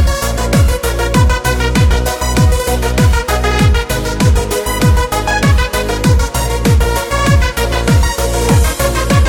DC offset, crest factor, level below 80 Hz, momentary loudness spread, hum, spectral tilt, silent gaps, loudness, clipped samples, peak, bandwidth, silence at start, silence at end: under 0.1%; 10 dB; -16 dBFS; 3 LU; none; -5 dB/octave; none; -13 LUFS; under 0.1%; 0 dBFS; 17.5 kHz; 0 s; 0 s